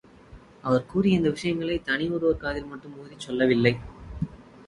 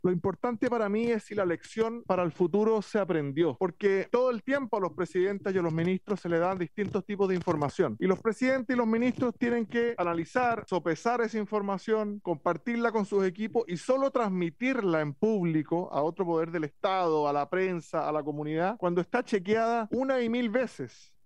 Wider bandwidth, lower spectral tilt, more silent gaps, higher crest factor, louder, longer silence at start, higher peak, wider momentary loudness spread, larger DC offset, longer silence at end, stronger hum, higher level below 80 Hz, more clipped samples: about the same, 11.5 kHz vs 10.5 kHz; about the same, -6.5 dB/octave vs -7 dB/octave; neither; about the same, 22 dB vs 18 dB; first, -26 LUFS vs -29 LUFS; first, 0.3 s vs 0.05 s; first, -4 dBFS vs -10 dBFS; first, 18 LU vs 4 LU; second, under 0.1% vs 0.1%; second, 0.05 s vs 0.35 s; neither; first, -48 dBFS vs -70 dBFS; neither